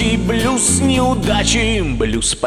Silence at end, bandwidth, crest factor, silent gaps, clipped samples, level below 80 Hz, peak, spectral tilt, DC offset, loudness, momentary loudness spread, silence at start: 0 s; 15 kHz; 12 dB; none; under 0.1%; -26 dBFS; -2 dBFS; -3.5 dB/octave; under 0.1%; -15 LUFS; 4 LU; 0 s